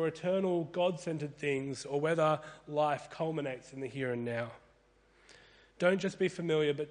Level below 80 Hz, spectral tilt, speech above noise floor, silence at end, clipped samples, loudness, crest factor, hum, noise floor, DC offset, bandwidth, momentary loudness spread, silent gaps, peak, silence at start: -72 dBFS; -6 dB/octave; 33 dB; 0 s; under 0.1%; -34 LUFS; 20 dB; none; -67 dBFS; under 0.1%; 10 kHz; 8 LU; none; -14 dBFS; 0 s